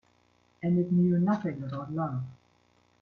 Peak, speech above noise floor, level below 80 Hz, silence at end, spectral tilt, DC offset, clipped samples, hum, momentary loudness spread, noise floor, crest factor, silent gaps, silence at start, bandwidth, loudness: -14 dBFS; 39 dB; -68 dBFS; 0.65 s; -10.5 dB/octave; under 0.1%; under 0.1%; 60 Hz at -45 dBFS; 12 LU; -67 dBFS; 16 dB; none; 0.6 s; 4.2 kHz; -29 LUFS